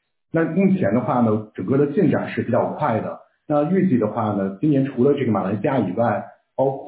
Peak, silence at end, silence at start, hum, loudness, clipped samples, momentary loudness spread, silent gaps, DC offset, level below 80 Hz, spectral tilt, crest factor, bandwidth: -6 dBFS; 0 s; 0.35 s; none; -21 LUFS; under 0.1%; 6 LU; none; under 0.1%; -58 dBFS; -12.5 dB/octave; 14 dB; 4 kHz